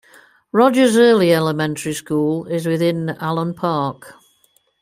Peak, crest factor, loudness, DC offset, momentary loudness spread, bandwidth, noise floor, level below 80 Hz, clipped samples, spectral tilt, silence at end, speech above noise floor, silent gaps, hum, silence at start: -2 dBFS; 16 dB; -17 LUFS; under 0.1%; 10 LU; 16 kHz; -60 dBFS; -62 dBFS; under 0.1%; -5.5 dB/octave; 0.7 s; 43 dB; none; none; 0.55 s